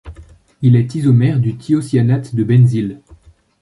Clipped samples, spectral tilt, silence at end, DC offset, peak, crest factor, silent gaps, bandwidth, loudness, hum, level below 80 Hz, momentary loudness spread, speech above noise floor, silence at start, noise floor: under 0.1%; -9 dB/octave; 0.65 s; under 0.1%; -2 dBFS; 12 dB; none; 11.5 kHz; -14 LUFS; none; -44 dBFS; 6 LU; 32 dB; 0.05 s; -45 dBFS